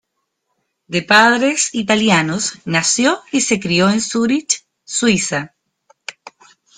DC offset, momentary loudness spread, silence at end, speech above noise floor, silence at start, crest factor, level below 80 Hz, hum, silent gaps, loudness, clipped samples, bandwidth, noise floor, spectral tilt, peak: under 0.1%; 12 LU; 0.65 s; 57 dB; 0.9 s; 18 dB; -56 dBFS; none; none; -15 LUFS; under 0.1%; 10.5 kHz; -72 dBFS; -3 dB/octave; 0 dBFS